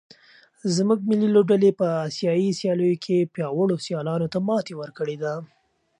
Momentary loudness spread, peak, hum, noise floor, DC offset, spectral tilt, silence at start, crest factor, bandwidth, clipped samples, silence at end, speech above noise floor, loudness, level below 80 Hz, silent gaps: 11 LU; -6 dBFS; none; -55 dBFS; under 0.1%; -6.5 dB/octave; 0.65 s; 16 dB; 10.5 kHz; under 0.1%; 0.55 s; 33 dB; -23 LUFS; -70 dBFS; none